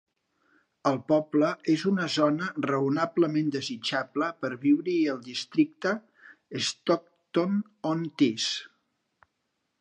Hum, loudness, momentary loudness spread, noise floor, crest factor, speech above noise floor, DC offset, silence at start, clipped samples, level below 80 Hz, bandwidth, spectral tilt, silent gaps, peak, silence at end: none; -28 LUFS; 6 LU; -79 dBFS; 18 dB; 52 dB; under 0.1%; 0.85 s; under 0.1%; -78 dBFS; 9.8 kHz; -5 dB/octave; none; -10 dBFS; 1.15 s